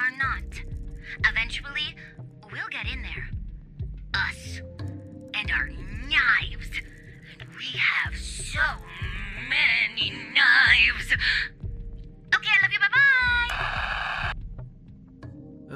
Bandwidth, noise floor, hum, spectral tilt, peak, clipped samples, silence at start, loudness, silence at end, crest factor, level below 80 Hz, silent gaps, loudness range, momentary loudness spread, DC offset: 14 kHz; -47 dBFS; none; -2.5 dB/octave; -6 dBFS; under 0.1%; 0 s; -23 LUFS; 0 s; 20 dB; -40 dBFS; none; 11 LU; 21 LU; under 0.1%